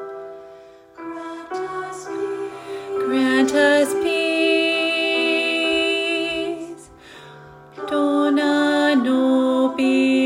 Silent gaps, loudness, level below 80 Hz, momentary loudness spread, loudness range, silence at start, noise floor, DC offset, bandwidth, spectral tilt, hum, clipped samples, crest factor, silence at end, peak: none; -19 LUFS; -62 dBFS; 16 LU; 4 LU; 0 s; -44 dBFS; under 0.1%; 15.5 kHz; -3 dB/octave; none; under 0.1%; 14 dB; 0 s; -6 dBFS